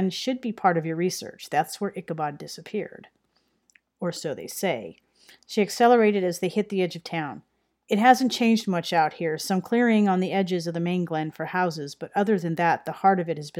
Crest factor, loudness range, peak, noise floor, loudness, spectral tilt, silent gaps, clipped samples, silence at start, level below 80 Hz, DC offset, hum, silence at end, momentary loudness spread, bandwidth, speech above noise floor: 22 dB; 10 LU; -4 dBFS; -70 dBFS; -25 LUFS; -5.5 dB/octave; none; under 0.1%; 0 s; -74 dBFS; under 0.1%; none; 0 s; 13 LU; 17 kHz; 46 dB